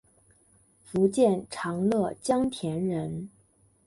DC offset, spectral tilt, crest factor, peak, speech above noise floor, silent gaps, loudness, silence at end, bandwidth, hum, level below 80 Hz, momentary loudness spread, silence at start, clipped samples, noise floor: under 0.1%; -6.5 dB/octave; 18 dB; -10 dBFS; 37 dB; none; -27 LUFS; 0.6 s; 11.5 kHz; none; -60 dBFS; 11 LU; 0.9 s; under 0.1%; -64 dBFS